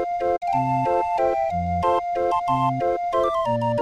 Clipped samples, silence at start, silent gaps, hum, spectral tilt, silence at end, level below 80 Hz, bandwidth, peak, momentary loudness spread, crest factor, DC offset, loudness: under 0.1%; 0 s; none; none; -7.5 dB/octave; 0 s; -48 dBFS; 10.5 kHz; -8 dBFS; 2 LU; 14 dB; under 0.1%; -22 LUFS